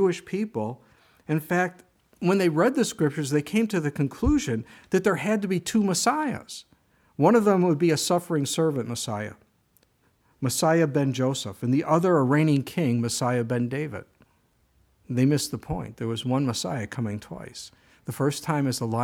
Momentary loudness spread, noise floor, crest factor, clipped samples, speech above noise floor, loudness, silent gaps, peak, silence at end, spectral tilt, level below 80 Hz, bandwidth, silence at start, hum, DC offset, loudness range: 13 LU; -66 dBFS; 18 dB; under 0.1%; 41 dB; -25 LUFS; none; -8 dBFS; 0 s; -5.5 dB/octave; -48 dBFS; 18 kHz; 0 s; none; under 0.1%; 5 LU